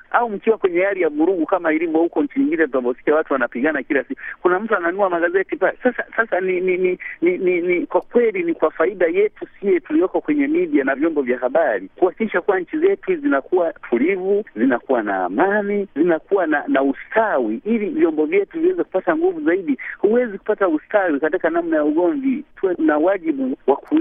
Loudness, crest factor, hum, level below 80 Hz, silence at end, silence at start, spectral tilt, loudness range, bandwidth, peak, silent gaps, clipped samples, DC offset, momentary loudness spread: -19 LUFS; 18 dB; none; -58 dBFS; 0 s; 0.1 s; -10 dB/octave; 1 LU; 3.7 kHz; 0 dBFS; none; under 0.1%; under 0.1%; 3 LU